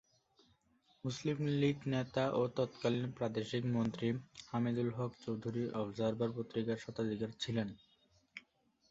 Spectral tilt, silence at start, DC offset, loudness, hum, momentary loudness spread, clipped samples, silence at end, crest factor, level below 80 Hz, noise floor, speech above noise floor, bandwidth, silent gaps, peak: -6 dB/octave; 1.05 s; under 0.1%; -38 LUFS; none; 9 LU; under 0.1%; 0.5 s; 18 dB; -70 dBFS; -74 dBFS; 37 dB; 8 kHz; none; -20 dBFS